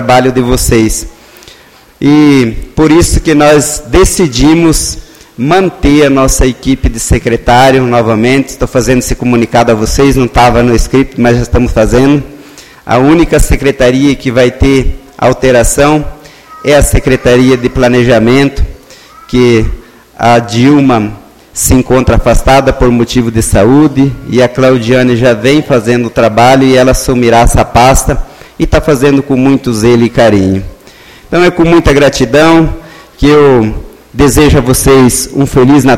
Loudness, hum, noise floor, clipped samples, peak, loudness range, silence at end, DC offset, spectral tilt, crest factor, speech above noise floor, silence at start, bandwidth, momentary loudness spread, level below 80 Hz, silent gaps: -7 LUFS; none; -38 dBFS; 2%; 0 dBFS; 2 LU; 0 s; under 0.1%; -5.5 dB/octave; 6 dB; 32 dB; 0 s; 16.5 kHz; 7 LU; -18 dBFS; none